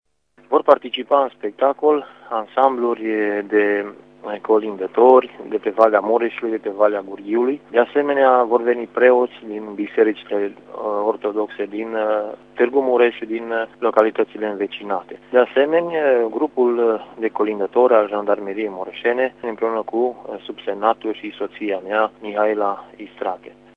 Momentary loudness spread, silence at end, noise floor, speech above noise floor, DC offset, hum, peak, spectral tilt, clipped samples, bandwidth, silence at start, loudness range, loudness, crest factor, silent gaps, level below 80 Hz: 12 LU; 0.25 s; -49 dBFS; 30 dB; under 0.1%; 50 Hz at -60 dBFS; 0 dBFS; -7 dB/octave; under 0.1%; 5 kHz; 0.5 s; 5 LU; -19 LUFS; 18 dB; none; -70 dBFS